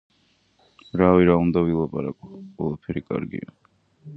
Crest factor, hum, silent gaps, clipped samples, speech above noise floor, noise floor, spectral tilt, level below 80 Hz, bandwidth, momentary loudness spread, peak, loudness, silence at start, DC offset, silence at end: 22 dB; none; none; under 0.1%; 42 dB; -64 dBFS; -10.5 dB/octave; -46 dBFS; 4.7 kHz; 20 LU; -2 dBFS; -22 LUFS; 0.95 s; under 0.1%; 0 s